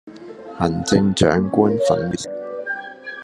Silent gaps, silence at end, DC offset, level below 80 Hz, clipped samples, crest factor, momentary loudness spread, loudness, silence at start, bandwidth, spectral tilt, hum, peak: none; 0 s; under 0.1%; -50 dBFS; under 0.1%; 20 dB; 17 LU; -19 LUFS; 0.05 s; 12 kHz; -5.5 dB/octave; none; 0 dBFS